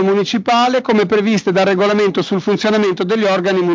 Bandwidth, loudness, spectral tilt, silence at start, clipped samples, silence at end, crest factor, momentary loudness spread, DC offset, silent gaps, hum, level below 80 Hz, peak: 7.6 kHz; -14 LUFS; -5.5 dB/octave; 0 s; under 0.1%; 0 s; 12 dB; 3 LU; under 0.1%; none; none; -56 dBFS; -2 dBFS